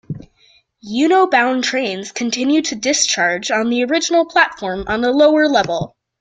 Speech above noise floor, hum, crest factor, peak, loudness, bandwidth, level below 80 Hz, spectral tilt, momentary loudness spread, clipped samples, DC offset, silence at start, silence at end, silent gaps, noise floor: 39 dB; none; 16 dB; 0 dBFS; -16 LUFS; 9.4 kHz; -50 dBFS; -3 dB/octave; 11 LU; under 0.1%; under 0.1%; 0.1 s; 0.35 s; none; -54 dBFS